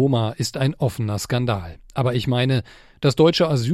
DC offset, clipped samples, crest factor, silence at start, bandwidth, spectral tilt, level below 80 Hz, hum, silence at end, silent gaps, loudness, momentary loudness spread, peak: under 0.1%; under 0.1%; 16 dB; 0 s; 14 kHz; -6 dB/octave; -48 dBFS; none; 0 s; none; -21 LUFS; 8 LU; -4 dBFS